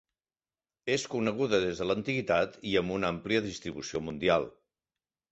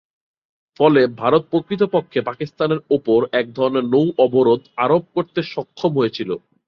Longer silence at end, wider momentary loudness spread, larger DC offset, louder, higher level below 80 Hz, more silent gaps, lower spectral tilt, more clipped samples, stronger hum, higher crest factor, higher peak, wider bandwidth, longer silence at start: first, 0.8 s vs 0.3 s; about the same, 8 LU vs 9 LU; neither; second, -30 LUFS vs -18 LUFS; about the same, -58 dBFS vs -60 dBFS; neither; second, -5 dB/octave vs -8 dB/octave; neither; neither; about the same, 20 dB vs 16 dB; second, -12 dBFS vs -2 dBFS; first, 8.2 kHz vs 6.4 kHz; about the same, 0.85 s vs 0.8 s